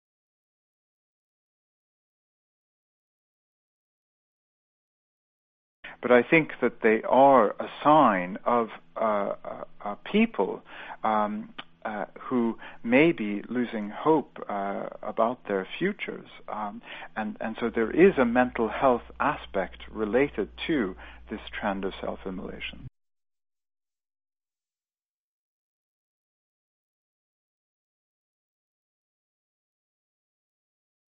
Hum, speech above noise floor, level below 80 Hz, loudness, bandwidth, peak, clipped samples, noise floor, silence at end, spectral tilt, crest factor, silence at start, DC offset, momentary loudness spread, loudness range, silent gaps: none; over 64 dB; -56 dBFS; -26 LUFS; 4.8 kHz; -6 dBFS; under 0.1%; under -90 dBFS; 8.3 s; -9 dB/octave; 22 dB; 5.85 s; under 0.1%; 17 LU; 12 LU; none